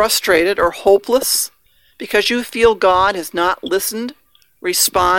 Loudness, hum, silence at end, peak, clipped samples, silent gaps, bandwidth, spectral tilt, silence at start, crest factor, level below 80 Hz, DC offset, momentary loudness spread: -15 LUFS; none; 0 s; 0 dBFS; under 0.1%; none; 18 kHz; -1.5 dB/octave; 0 s; 16 dB; -44 dBFS; under 0.1%; 10 LU